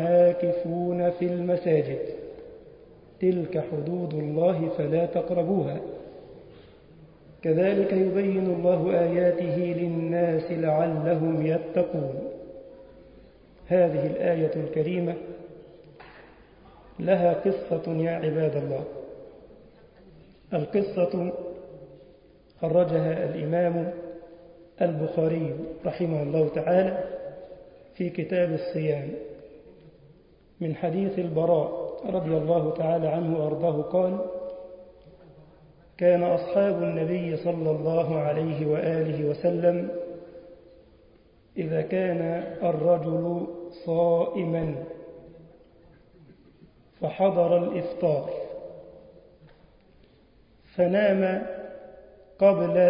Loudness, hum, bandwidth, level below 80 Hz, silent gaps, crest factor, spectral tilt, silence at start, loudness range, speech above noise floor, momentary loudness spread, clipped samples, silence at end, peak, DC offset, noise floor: -26 LUFS; none; 5.2 kHz; -60 dBFS; none; 18 dB; -12 dB/octave; 0 s; 5 LU; 33 dB; 16 LU; under 0.1%; 0 s; -8 dBFS; under 0.1%; -58 dBFS